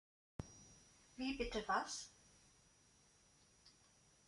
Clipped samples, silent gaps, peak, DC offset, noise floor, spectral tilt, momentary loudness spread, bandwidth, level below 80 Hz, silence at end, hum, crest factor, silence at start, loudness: under 0.1%; none; -26 dBFS; under 0.1%; -72 dBFS; -3 dB/octave; 26 LU; 11.5 kHz; -64 dBFS; 0.55 s; none; 24 dB; 0.4 s; -45 LUFS